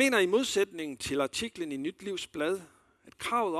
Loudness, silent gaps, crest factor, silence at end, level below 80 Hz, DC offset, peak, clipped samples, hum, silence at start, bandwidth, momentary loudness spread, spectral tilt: -31 LUFS; none; 20 dB; 0 s; -66 dBFS; under 0.1%; -12 dBFS; under 0.1%; none; 0 s; 14 kHz; 11 LU; -3 dB/octave